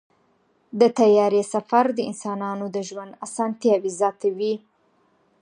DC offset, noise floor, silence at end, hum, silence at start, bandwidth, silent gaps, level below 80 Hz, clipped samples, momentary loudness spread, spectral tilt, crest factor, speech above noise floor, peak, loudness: under 0.1%; -64 dBFS; 0.85 s; none; 0.75 s; 11 kHz; none; -78 dBFS; under 0.1%; 15 LU; -5.5 dB/octave; 18 dB; 43 dB; -4 dBFS; -22 LUFS